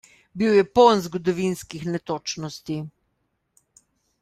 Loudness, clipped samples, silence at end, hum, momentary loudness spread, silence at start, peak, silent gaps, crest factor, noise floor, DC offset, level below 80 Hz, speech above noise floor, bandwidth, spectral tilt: -22 LUFS; under 0.1%; 1.3 s; none; 16 LU; 0.35 s; -4 dBFS; none; 20 dB; -73 dBFS; under 0.1%; -58 dBFS; 52 dB; 14.5 kHz; -5.5 dB/octave